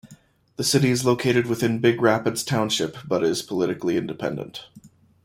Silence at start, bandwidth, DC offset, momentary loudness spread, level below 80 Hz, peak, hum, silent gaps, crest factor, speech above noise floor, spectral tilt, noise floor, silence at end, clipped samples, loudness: 0.05 s; 16.5 kHz; under 0.1%; 10 LU; -60 dBFS; -4 dBFS; none; none; 18 dB; 30 dB; -4.5 dB/octave; -52 dBFS; 0.4 s; under 0.1%; -22 LUFS